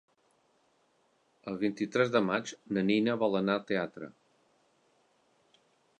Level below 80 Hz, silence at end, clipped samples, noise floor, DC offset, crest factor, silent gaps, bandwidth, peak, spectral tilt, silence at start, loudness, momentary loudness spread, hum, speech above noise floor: -74 dBFS; 1.9 s; under 0.1%; -71 dBFS; under 0.1%; 22 dB; none; 9.2 kHz; -12 dBFS; -6 dB/octave; 1.45 s; -31 LUFS; 14 LU; none; 41 dB